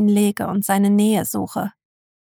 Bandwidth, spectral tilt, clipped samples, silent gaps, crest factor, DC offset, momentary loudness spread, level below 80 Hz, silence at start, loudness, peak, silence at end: 20 kHz; -5.5 dB/octave; under 0.1%; none; 14 dB; under 0.1%; 11 LU; -62 dBFS; 0 s; -19 LUFS; -4 dBFS; 0.5 s